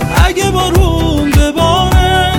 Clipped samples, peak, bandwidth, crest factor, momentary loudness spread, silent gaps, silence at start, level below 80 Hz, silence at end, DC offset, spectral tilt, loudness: under 0.1%; 0 dBFS; 17.5 kHz; 10 dB; 2 LU; none; 0 s; -14 dBFS; 0 s; under 0.1%; -5 dB/octave; -11 LUFS